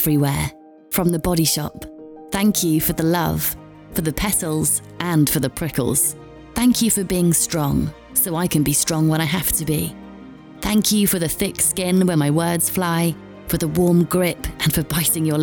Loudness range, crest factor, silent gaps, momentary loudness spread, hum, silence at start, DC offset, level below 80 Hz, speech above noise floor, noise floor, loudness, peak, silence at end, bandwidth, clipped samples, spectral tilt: 2 LU; 14 dB; none; 8 LU; none; 0 s; under 0.1%; -40 dBFS; 21 dB; -39 dBFS; -19 LUFS; -6 dBFS; 0 s; over 20 kHz; under 0.1%; -4.5 dB/octave